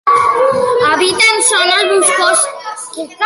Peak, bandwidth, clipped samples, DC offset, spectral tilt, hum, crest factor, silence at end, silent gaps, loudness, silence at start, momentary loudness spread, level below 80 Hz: 0 dBFS; 12 kHz; under 0.1%; under 0.1%; -0.5 dB/octave; none; 12 dB; 0 s; none; -10 LUFS; 0.05 s; 15 LU; -54 dBFS